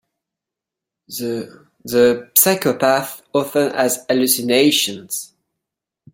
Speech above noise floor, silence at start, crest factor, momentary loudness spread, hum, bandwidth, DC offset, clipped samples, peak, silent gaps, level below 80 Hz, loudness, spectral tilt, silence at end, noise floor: 68 dB; 1.1 s; 20 dB; 14 LU; none; 17 kHz; under 0.1%; under 0.1%; 0 dBFS; none; -62 dBFS; -17 LUFS; -3 dB/octave; 0.9 s; -85 dBFS